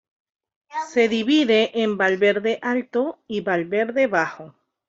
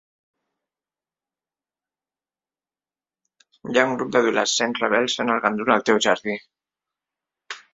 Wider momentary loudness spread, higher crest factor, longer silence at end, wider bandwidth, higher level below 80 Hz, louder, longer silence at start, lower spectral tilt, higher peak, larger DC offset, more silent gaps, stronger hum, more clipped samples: second, 10 LU vs 13 LU; second, 16 dB vs 24 dB; first, 0.4 s vs 0.15 s; about the same, 7.8 kHz vs 8 kHz; about the same, -68 dBFS vs -68 dBFS; about the same, -21 LUFS vs -21 LUFS; second, 0.7 s vs 3.65 s; first, -5 dB/octave vs -3 dB/octave; second, -6 dBFS vs -2 dBFS; neither; neither; neither; neither